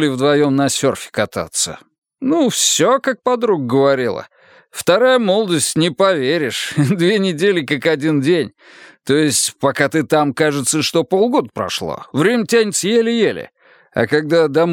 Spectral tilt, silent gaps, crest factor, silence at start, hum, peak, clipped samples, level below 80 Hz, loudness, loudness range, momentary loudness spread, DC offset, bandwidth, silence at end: -4 dB/octave; 1.98-2.02 s; 16 dB; 0 s; none; 0 dBFS; under 0.1%; -60 dBFS; -16 LUFS; 1 LU; 8 LU; under 0.1%; 18 kHz; 0 s